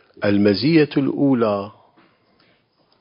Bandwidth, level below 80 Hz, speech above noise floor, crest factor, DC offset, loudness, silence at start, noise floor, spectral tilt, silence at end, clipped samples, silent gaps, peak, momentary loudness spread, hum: 5.4 kHz; -56 dBFS; 44 dB; 16 dB; under 0.1%; -18 LUFS; 0.2 s; -61 dBFS; -11.5 dB/octave; 1.3 s; under 0.1%; none; -4 dBFS; 8 LU; none